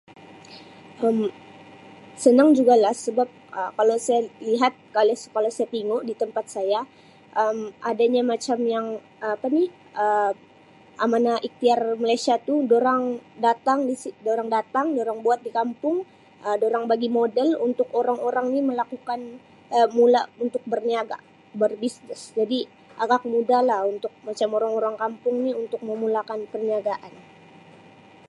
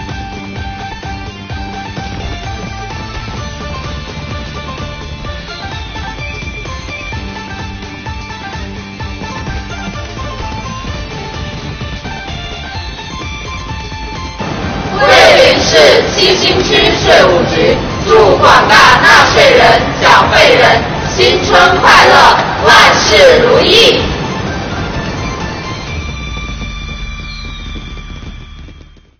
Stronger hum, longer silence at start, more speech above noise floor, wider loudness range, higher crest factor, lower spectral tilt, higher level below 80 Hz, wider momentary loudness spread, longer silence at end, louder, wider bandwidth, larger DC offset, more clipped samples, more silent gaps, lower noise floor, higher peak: neither; first, 0.2 s vs 0 s; about the same, 29 dB vs 31 dB; second, 4 LU vs 17 LU; first, 20 dB vs 12 dB; about the same, -4.5 dB/octave vs -3.5 dB/octave; second, -78 dBFS vs -28 dBFS; second, 11 LU vs 19 LU; first, 1.2 s vs 0.4 s; second, -23 LUFS vs -7 LUFS; second, 11.5 kHz vs over 20 kHz; neither; second, under 0.1% vs 1%; neither; first, -51 dBFS vs -36 dBFS; second, -4 dBFS vs 0 dBFS